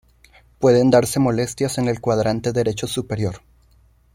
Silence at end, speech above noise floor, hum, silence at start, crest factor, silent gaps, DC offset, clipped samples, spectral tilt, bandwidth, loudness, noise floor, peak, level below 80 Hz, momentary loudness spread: 0.75 s; 36 dB; none; 0.6 s; 18 dB; none; under 0.1%; under 0.1%; -6 dB/octave; 16.5 kHz; -19 LUFS; -55 dBFS; -2 dBFS; -48 dBFS; 10 LU